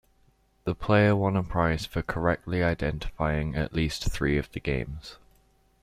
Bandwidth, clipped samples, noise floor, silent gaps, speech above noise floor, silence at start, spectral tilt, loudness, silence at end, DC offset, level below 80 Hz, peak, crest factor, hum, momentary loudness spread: 15 kHz; under 0.1%; -64 dBFS; none; 38 dB; 0.65 s; -6.5 dB/octave; -27 LUFS; 0.65 s; under 0.1%; -40 dBFS; -8 dBFS; 20 dB; none; 10 LU